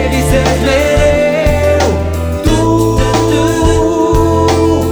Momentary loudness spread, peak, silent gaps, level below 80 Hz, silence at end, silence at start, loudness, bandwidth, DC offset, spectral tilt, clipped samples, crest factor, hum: 3 LU; 0 dBFS; none; -18 dBFS; 0 s; 0 s; -11 LUFS; over 20 kHz; 0.4%; -6 dB/octave; under 0.1%; 10 dB; none